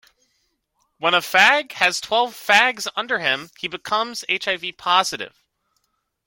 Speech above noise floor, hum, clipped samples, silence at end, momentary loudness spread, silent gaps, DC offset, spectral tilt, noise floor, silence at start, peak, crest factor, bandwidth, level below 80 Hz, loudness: 51 dB; none; under 0.1%; 1 s; 12 LU; none; under 0.1%; -1 dB/octave; -71 dBFS; 1 s; 0 dBFS; 22 dB; 17 kHz; -66 dBFS; -19 LUFS